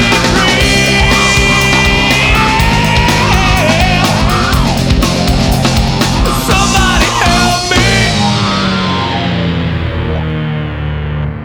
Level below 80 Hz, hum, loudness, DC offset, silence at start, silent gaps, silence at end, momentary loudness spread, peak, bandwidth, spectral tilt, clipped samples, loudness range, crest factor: -18 dBFS; none; -10 LUFS; under 0.1%; 0 s; none; 0 s; 8 LU; 0 dBFS; over 20 kHz; -4 dB/octave; under 0.1%; 4 LU; 10 dB